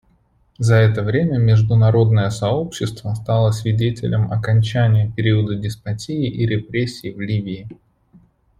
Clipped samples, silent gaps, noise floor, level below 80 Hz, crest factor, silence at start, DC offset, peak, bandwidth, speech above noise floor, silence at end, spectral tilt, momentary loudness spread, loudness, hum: under 0.1%; none; -58 dBFS; -46 dBFS; 16 dB; 0.6 s; under 0.1%; -2 dBFS; 11.5 kHz; 41 dB; 0.85 s; -7 dB/octave; 11 LU; -18 LUFS; none